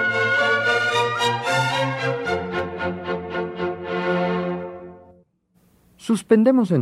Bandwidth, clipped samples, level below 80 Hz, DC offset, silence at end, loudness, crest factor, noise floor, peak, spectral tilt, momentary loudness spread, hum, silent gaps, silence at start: 14 kHz; under 0.1%; -60 dBFS; under 0.1%; 0 s; -21 LUFS; 18 dB; -62 dBFS; -4 dBFS; -5 dB/octave; 11 LU; none; none; 0 s